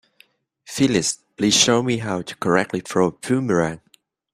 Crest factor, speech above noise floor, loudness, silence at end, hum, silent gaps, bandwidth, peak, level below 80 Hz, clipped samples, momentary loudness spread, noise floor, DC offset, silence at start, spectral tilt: 20 dB; 38 dB; -20 LUFS; 0.55 s; none; none; 15.5 kHz; -2 dBFS; -56 dBFS; under 0.1%; 11 LU; -57 dBFS; under 0.1%; 0.7 s; -3.5 dB/octave